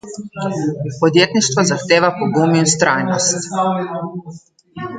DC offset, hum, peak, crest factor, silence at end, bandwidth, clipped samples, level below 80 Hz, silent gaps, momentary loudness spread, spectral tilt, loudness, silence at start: under 0.1%; none; 0 dBFS; 16 dB; 0 s; 9.6 kHz; under 0.1%; -58 dBFS; none; 13 LU; -4 dB/octave; -16 LUFS; 0.05 s